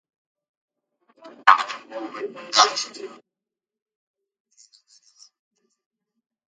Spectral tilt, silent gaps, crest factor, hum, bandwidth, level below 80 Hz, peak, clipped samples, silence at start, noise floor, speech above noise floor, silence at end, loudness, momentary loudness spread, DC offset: 1 dB/octave; none; 28 dB; none; 9.6 kHz; -88 dBFS; 0 dBFS; under 0.1%; 1.25 s; -88 dBFS; 65 dB; 3.5 s; -20 LUFS; 18 LU; under 0.1%